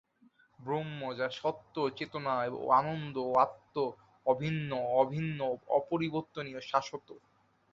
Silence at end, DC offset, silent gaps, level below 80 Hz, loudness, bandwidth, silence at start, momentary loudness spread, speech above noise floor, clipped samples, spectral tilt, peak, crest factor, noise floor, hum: 0.55 s; under 0.1%; none; -72 dBFS; -33 LUFS; 7.4 kHz; 0.6 s; 9 LU; 34 dB; under 0.1%; -7 dB/octave; -12 dBFS; 22 dB; -66 dBFS; none